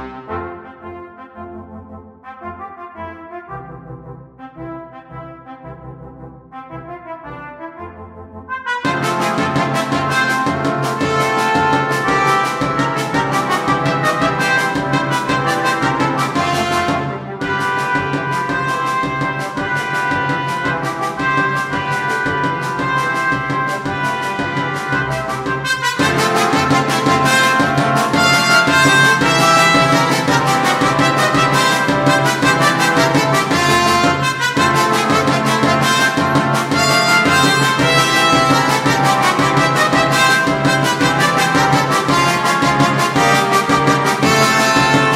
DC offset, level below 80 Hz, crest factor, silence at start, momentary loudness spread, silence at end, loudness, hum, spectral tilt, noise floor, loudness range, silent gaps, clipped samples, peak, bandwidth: under 0.1%; -46 dBFS; 16 dB; 0 s; 20 LU; 0 s; -14 LUFS; none; -4 dB/octave; -36 dBFS; 20 LU; none; under 0.1%; 0 dBFS; 16 kHz